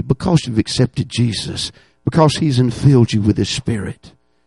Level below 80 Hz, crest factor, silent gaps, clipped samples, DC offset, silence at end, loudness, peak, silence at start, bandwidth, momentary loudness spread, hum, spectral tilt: -40 dBFS; 16 dB; none; under 0.1%; under 0.1%; 0.35 s; -16 LUFS; 0 dBFS; 0 s; 11.5 kHz; 11 LU; none; -6 dB/octave